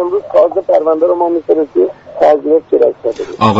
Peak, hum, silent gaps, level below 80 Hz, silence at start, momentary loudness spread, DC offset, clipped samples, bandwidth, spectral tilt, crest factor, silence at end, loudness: 0 dBFS; none; none; -52 dBFS; 0 s; 4 LU; under 0.1%; under 0.1%; 7.8 kHz; -7.5 dB/octave; 12 dB; 0 s; -12 LUFS